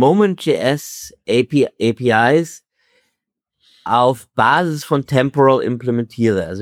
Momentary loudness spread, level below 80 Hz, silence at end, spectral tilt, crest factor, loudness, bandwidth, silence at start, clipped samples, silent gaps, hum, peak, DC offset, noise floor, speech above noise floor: 7 LU; -56 dBFS; 0 s; -6 dB/octave; 16 dB; -16 LUFS; 16.5 kHz; 0 s; under 0.1%; none; none; -2 dBFS; under 0.1%; -78 dBFS; 62 dB